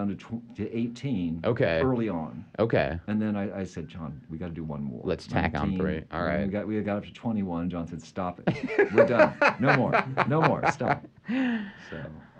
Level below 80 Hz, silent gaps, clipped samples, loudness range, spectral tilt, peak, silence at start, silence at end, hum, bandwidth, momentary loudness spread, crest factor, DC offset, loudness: -50 dBFS; none; under 0.1%; 7 LU; -7.5 dB/octave; -6 dBFS; 0 s; 0.15 s; none; 9 kHz; 16 LU; 22 dB; under 0.1%; -27 LUFS